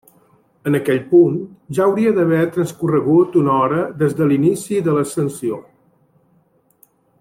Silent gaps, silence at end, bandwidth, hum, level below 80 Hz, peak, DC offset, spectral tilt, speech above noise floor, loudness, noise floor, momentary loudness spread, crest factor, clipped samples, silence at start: none; 1.6 s; 15.5 kHz; none; -58 dBFS; -2 dBFS; under 0.1%; -7.5 dB/octave; 42 dB; -17 LUFS; -58 dBFS; 10 LU; 14 dB; under 0.1%; 0.65 s